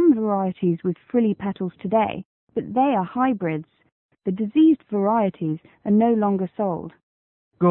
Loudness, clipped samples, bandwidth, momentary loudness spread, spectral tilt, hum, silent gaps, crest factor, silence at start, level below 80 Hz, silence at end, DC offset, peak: -22 LUFS; under 0.1%; 3.8 kHz; 13 LU; -12.5 dB/octave; none; 2.25-2.47 s, 3.92-4.09 s, 7.03-7.51 s; 14 dB; 0 s; -62 dBFS; 0 s; under 0.1%; -8 dBFS